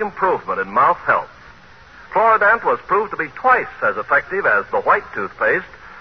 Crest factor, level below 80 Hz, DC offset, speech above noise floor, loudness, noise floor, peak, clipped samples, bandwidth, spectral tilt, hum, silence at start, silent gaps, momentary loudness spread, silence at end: 16 dB; -52 dBFS; 0.2%; 26 dB; -17 LUFS; -44 dBFS; -2 dBFS; under 0.1%; 6.4 kHz; -6.5 dB/octave; none; 0 s; none; 8 LU; 0 s